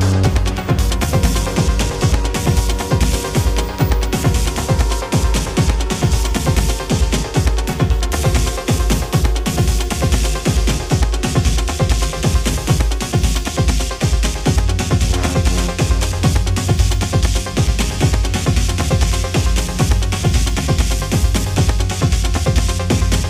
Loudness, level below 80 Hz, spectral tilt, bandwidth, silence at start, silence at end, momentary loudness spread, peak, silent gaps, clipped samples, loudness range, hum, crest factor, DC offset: -17 LUFS; -18 dBFS; -5 dB/octave; 15.5 kHz; 0 s; 0 s; 2 LU; -2 dBFS; none; under 0.1%; 1 LU; none; 14 dB; under 0.1%